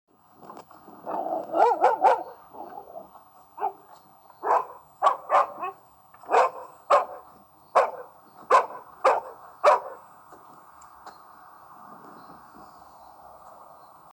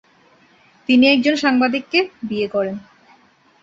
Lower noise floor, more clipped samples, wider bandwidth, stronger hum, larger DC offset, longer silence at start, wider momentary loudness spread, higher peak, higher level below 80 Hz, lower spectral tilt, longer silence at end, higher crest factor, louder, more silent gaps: about the same, -54 dBFS vs -54 dBFS; neither; first, 20 kHz vs 7.6 kHz; neither; neither; second, 0.45 s vs 0.9 s; first, 25 LU vs 13 LU; second, -6 dBFS vs -2 dBFS; second, -74 dBFS vs -60 dBFS; second, -3 dB/octave vs -4.5 dB/octave; first, 1.5 s vs 0.85 s; about the same, 22 dB vs 18 dB; second, -24 LUFS vs -17 LUFS; neither